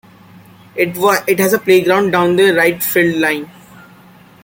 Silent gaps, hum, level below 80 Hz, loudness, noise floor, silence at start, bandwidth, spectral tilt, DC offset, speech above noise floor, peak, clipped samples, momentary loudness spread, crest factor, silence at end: none; none; -56 dBFS; -13 LUFS; -43 dBFS; 0.75 s; 17 kHz; -4.5 dB/octave; under 0.1%; 30 dB; 0 dBFS; under 0.1%; 8 LU; 14 dB; 1 s